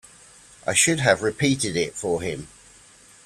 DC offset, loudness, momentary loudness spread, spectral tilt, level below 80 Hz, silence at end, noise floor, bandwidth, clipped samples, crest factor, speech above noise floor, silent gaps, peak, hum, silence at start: under 0.1%; -22 LUFS; 13 LU; -3.5 dB/octave; -54 dBFS; 0.8 s; -51 dBFS; 14.5 kHz; under 0.1%; 22 dB; 29 dB; none; -2 dBFS; none; 0.65 s